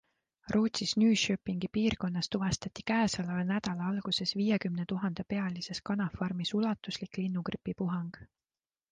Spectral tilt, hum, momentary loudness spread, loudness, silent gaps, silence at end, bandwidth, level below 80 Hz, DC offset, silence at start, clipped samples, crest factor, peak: -5 dB/octave; none; 7 LU; -32 LUFS; none; 0.65 s; 9.8 kHz; -60 dBFS; under 0.1%; 0.45 s; under 0.1%; 16 dB; -16 dBFS